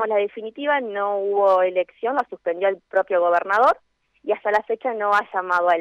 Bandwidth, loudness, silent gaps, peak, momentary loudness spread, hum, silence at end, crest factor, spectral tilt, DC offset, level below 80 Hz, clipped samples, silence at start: 8.8 kHz; -21 LUFS; none; -8 dBFS; 9 LU; none; 0 s; 12 dB; -4.5 dB/octave; under 0.1%; -68 dBFS; under 0.1%; 0 s